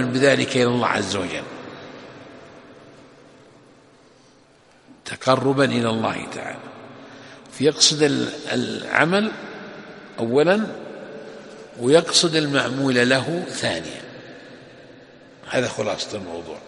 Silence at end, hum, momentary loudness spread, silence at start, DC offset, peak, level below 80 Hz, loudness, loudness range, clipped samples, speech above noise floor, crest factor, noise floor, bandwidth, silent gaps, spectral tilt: 0 s; none; 23 LU; 0 s; under 0.1%; 0 dBFS; -62 dBFS; -20 LUFS; 8 LU; under 0.1%; 33 dB; 22 dB; -53 dBFS; 11.5 kHz; none; -3.5 dB/octave